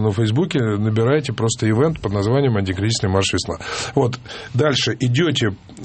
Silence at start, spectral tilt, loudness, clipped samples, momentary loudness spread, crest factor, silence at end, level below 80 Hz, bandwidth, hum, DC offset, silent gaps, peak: 0 s; -5.5 dB/octave; -19 LUFS; under 0.1%; 6 LU; 16 dB; 0 s; -48 dBFS; 8.8 kHz; none; under 0.1%; none; -2 dBFS